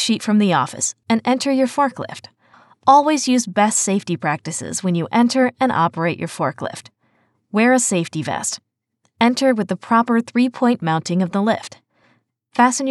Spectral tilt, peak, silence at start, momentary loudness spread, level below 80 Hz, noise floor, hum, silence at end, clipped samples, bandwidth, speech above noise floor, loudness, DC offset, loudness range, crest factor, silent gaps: -4 dB/octave; 0 dBFS; 0 s; 9 LU; -86 dBFS; -68 dBFS; none; 0 s; under 0.1%; 12.5 kHz; 50 dB; -18 LUFS; under 0.1%; 3 LU; 18 dB; none